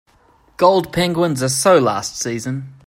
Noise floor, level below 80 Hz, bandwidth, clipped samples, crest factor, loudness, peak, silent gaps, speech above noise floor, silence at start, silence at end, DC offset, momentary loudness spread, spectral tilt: -54 dBFS; -50 dBFS; 16 kHz; under 0.1%; 16 dB; -17 LUFS; 0 dBFS; none; 37 dB; 0.6 s; 0.15 s; under 0.1%; 10 LU; -4.5 dB/octave